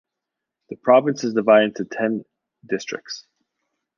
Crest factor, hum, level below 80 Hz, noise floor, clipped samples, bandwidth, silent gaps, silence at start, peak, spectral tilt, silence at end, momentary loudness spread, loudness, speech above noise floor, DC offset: 20 dB; none; -72 dBFS; -84 dBFS; under 0.1%; 7.2 kHz; none; 0.7 s; -2 dBFS; -5 dB/octave; 0.8 s; 17 LU; -20 LUFS; 64 dB; under 0.1%